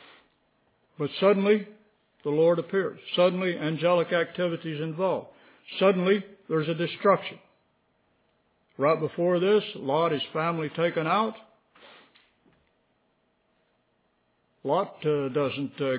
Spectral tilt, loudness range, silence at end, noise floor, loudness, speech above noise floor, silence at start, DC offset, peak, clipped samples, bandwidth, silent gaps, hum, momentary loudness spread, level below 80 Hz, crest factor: -10 dB/octave; 7 LU; 0 s; -71 dBFS; -26 LUFS; 45 dB; 1 s; under 0.1%; -8 dBFS; under 0.1%; 4 kHz; none; none; 8 LU; -78 dBFS; 18 dB